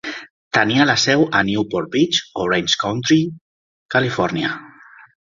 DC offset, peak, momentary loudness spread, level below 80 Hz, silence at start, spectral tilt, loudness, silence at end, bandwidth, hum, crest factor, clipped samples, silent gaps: under 0.1%; -2 dBFS; 10 LU; -54 dBFS; 0.05 s; -4 dB/octave; -18 LUFS; 0.7 s; 7.6 kHz; none; 18 dB; under 0.1%; 0.30-0.51 s, 3.41-3.89 s